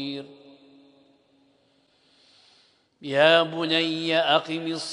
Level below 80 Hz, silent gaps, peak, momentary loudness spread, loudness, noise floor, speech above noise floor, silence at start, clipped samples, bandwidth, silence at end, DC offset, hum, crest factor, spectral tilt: -78 dBFS; none; -4 dBFS; 16 LU; -22 LUFS; -64 dBFS; 41 dB; 0 s; under 0.1%; 10.5 kHz; 0 s; under 0.1%; none; 24 dB; -4 dB/octave